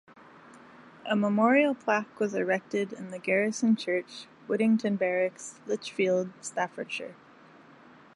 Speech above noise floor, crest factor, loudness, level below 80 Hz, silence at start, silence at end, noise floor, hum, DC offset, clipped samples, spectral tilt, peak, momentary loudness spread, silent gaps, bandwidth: 26 dB; 20 dB; -28 LUFS; -80 dBFS; 0.55 s; 1.05 s; -54 dBFS; none; under 0.1%; under 0.1%; -5 dB/octave; -10 dBFS; 12 LU; none; 11 kHz